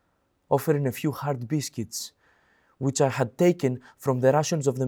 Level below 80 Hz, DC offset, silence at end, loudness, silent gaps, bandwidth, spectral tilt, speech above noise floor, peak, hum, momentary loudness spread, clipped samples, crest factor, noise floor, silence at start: -70 dBFS; under 0.1%; 0 s; -26 LUFS; none; over 20 kHz; -6 dB/octave; 46 dB; -8 dBFS; none; 10 LU; under 0.1%; 18 dB; -71 dBFS; 0.5 s